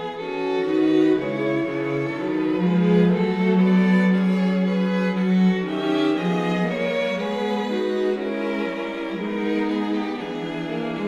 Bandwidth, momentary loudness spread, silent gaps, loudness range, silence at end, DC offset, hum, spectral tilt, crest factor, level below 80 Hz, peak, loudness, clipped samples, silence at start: 7.6 kHz; 9 LU; none; 5 LU; 0 s; under 0.1%; none; -8 dB/octave; 14 dB; -60 dBFS; -8 dBFS; -22 LUFS; under 0.1%; 0 s